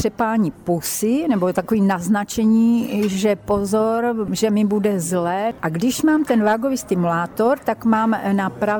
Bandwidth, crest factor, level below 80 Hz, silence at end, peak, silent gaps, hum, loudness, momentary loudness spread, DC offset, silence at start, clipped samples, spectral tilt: over 20 kHz; 12 dB; -50 dBFS; 0 s; -6 dBFS; none; none; -19 LUFS; 4 LU; under 0.1%; 0 s; under 0.1%; -5.5 dB/octave